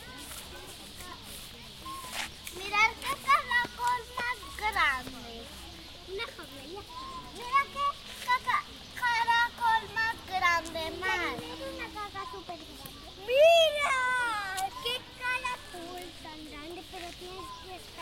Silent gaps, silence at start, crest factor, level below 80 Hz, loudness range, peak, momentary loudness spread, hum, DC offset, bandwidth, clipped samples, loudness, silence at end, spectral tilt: none; 0 s; 20 dB; -56 dBFS; 7 LU; -12 dBFS; 18 LU; none; under 0.1%; 16.5 kHz; under 0.1%; -29 LUFS; 0 s; -2 dB/octave